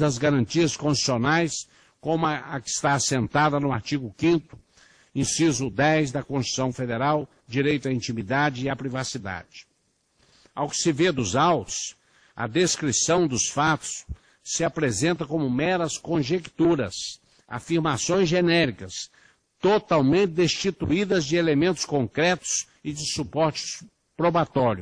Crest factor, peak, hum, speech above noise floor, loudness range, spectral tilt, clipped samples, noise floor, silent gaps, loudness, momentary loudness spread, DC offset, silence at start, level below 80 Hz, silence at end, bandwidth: 16 dB; -8 dBFS; none; 46 dB; 4 LU; -4.5 dB/octave; under 0.1%; -69 dBFS; none; -24 LUFS; 12 LU; under 0.1%; 0 s; -54 dBFS; 0 s; 10.5 kHz